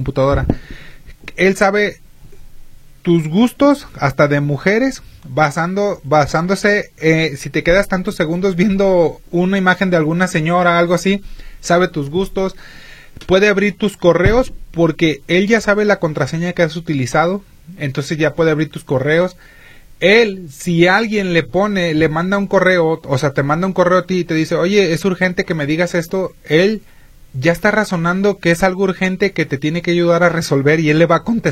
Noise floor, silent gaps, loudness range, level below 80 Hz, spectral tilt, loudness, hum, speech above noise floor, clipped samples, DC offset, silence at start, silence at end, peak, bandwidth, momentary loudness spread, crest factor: -35 dBFS; none; 2 LU; -36 dBFS; -6 dB/octave; -15 LUFS; none; 21 dB; under 0.1%; under 0.1%; 0 s; 0 s; 0 dBFS; 15.5 kHz; 7 LU; 16 dB